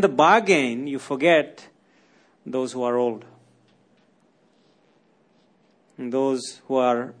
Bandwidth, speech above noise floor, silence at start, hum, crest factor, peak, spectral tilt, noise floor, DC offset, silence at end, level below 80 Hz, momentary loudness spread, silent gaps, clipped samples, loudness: 10.5 kHz; 40 dB; 0 s; none; 20 dB; -4 dBFS; -4.5 dB/octave; -62 dBFS; under 0.1%; 0.1 s; -76 dBFS; 15 LU; none; under 0.1%; -22 LUFS